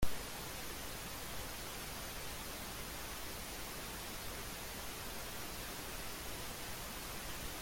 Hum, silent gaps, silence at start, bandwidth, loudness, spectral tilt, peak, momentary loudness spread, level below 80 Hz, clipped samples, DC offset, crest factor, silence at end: none; none; 0 s; 17 kHz; -44 LUFS; -2.5 dB/octave; -20 dBFS; 0 LU; -52 dBFS; under 0.1%; under 0.1%; 22 dB; 0 s